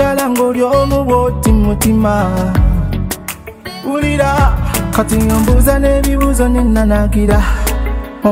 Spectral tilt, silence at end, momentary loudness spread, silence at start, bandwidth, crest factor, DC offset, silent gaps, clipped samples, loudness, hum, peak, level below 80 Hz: -6 dB/octave; 0 s; 8 LU; 0 s; 16.5 kHz; 12 dB; under 0.1%; none; under 0.1%; -13 LUFS; none; 0 dBFS; -16 dBFS